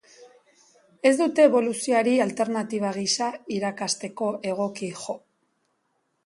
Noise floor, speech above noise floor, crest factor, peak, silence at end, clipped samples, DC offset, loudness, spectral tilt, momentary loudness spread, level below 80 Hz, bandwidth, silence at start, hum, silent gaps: -73 dBFS; 49 dB; 20 dB; -4 dBFS; 1.1 s; under 0.1%; under 0.1%; -24 LUFS; -3.5 dB/octave; 12 LU; -74 dBFS; 11.5 kHz; 0.2 s; none; none